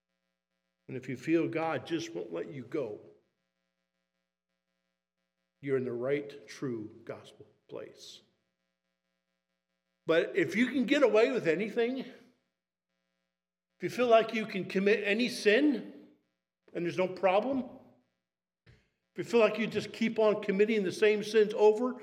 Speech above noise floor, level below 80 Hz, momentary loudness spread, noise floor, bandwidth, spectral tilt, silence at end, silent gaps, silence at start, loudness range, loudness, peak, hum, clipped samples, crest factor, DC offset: over 60 dB; -84 dBFS; 20 LU; under -90 dBFS; 13 kHz; -5.5 dB/octave; 0 s; none; 0.9 s; 13 LU; -30 LUFS; -12 dBFS; 60 Hz at -65 dBFS; under 0.1%; 20 dB; under 0.1%